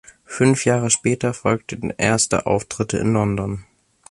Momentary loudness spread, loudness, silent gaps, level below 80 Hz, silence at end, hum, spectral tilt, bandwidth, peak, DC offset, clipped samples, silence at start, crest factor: 10 LU; -20 LUFS; none; -46 dBFS; 0.5 s; none; -4.5 dB/octave; 11.5 kHz; -2 dBFS; under 0.1%; under 0.1%; 0.3 s; 18 dB